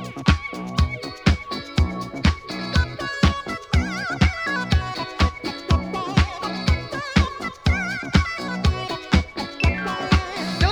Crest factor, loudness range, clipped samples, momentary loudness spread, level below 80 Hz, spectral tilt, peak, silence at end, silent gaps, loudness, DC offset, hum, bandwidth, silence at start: 20 dB; 1 LU; under 0.1%; 5 LU; -28 dBFS; -5.5 dB/octave; -2 dBFS; 0 s; none; -23 LUFS; under 0.1%; none; 11 kHz; 0 s